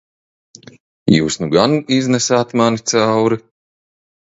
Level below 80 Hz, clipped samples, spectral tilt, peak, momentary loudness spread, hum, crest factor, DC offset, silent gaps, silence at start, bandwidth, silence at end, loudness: -50 dBFS; under 0.1%; -4.5 dB/octave; 0 dBFS; 3 LU; none; 16 dB; under 0.1%; none; 1.05 s; 8 kHz; 0.85 s; -15 LUFS